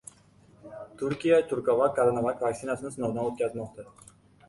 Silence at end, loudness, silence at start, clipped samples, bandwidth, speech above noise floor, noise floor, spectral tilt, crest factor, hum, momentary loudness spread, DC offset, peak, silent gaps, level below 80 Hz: 0.65 s; -27 LUFS; 0.65 s; under 0.1%; 11.5 kHz; 31 dB; -58 dBFS; -6 dB/octave; 18 dB; none; 21 LU; under 0.1%; -10 dBFS; none; -64 dBFS